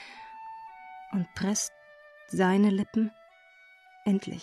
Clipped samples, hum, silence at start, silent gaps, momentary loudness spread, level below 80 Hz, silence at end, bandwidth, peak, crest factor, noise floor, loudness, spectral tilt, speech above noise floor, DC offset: under 0.1%; none; 0 s; none; 21 LU; -68 dBFS; 0 s; 13.5 kHz; -14 dBFS; 16 dB; -57 dBFS; -29 LUFS; -5 dB/octave; 30 dB; under 0.1%